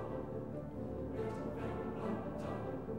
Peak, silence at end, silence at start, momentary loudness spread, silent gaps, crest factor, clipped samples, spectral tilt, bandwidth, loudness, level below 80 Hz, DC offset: -28 dBFS; 0 s; 0 s; 3 LU; none; 14 dB; under 0.1%; -8.5 dB/octave; 16.5 kHz; -42 LUFS; -56 dBFS; 0.1%